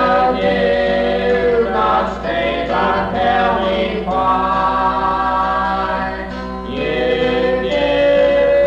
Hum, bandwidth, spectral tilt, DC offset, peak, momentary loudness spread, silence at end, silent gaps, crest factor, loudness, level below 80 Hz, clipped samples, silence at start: none; 8 kHz; -6.5 dB/octave; under 0.1%; -6 dBFS; 6 LU; 0 s; none; 10 dB; -16 LUFS; -34 dBFS; under 0.1%; 0 s